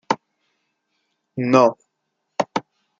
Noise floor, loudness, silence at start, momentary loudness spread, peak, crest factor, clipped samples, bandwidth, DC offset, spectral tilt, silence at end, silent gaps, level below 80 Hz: -76 dBFS; -20 LUFS; 0.1 s; 16 LU; -2 dBFS; 22 dB; under 0.1%; 7.6 kHz; under 0.1%; -6 dB/octave; 0.4 s; none; -66 dBFS